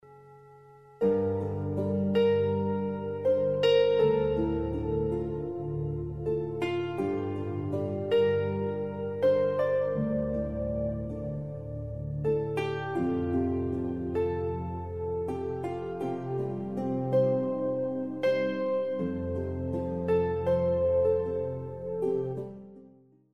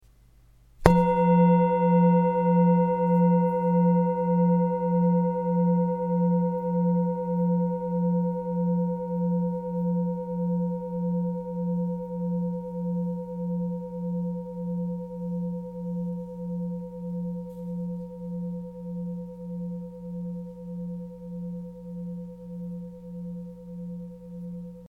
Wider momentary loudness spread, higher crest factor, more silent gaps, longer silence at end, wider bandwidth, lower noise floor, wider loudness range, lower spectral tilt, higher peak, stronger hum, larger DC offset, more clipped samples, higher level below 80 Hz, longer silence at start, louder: second, 9 LU vs 17 LU; second, 16 dB vs 26 dB; neither; first, 0.45 s vs 0 s; first, 7.8 kHz vs 3.7 kHz; about the same, -57 dBFS vs -56 dBFS; second, 5 LU vs 15 LU; second, -8.5 dB/octave vs -10.5 dB/octave; second, -14 dBFS vs 0 dBFS; neither; first, 0.2% vs under 0.1%; neither; about the same, -50 dBFS vs -50 dBFS; second, 0.05 s vs 0.8 s; second, -30 LUFS vs -26 LUFS